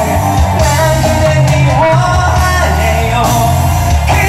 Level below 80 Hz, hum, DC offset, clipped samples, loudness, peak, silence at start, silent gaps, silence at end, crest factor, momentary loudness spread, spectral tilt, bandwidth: -20 dBFS; none; under 0.1%; under 0.1%; -10 LUFS; 0 dBFS; 0 s; none; 0 s; 8 dB; 2 LU; -5 dB/octave; 16 kHz